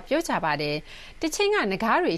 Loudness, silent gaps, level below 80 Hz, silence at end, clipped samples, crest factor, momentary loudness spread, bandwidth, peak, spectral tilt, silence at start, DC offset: -25 LUFS; none; -48 dBFS; 0 s; under 0.1%; 16 dB; 9 LU; 13.5 kHz; -10 dBFS; -4 dB/octave; 0 s; under 0.1%